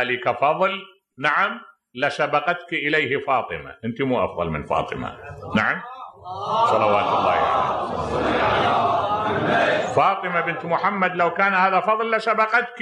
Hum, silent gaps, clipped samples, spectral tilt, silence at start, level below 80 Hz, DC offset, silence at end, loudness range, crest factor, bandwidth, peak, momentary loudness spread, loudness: none; none; under 0.1%; -5.5 dB/octave; 0 s; -50 dBFS; under 0.1%; 0 s; 4 LU; 16 dB; 10.5 kHz; -6 dBFS; 12 LU; -21 LUFS